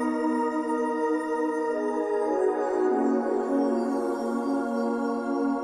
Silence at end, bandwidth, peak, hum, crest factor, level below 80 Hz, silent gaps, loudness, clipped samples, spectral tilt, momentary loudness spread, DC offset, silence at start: 0 s; 12.5 kHz; -14 dBFS; 60 Hz at -60 dBFS; 12 dB; -68 dBFS; none; -27 LUFS; under 0.1%; -5.5 dB/octave; 3 LU; under 0.1%; 0 s